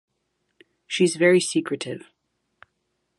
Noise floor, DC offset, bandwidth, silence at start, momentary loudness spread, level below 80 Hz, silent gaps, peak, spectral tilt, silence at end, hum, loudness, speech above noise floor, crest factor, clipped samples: -75 dBFS; under 0.1%; 11.5 kHz; 0.9 s; 15 LU; -74 dBFS; none; -4 dBFS; -4.5 dB/octave; 1.2 s; none; -22 LUFS; 54 dB; 20 dB; under 0.1%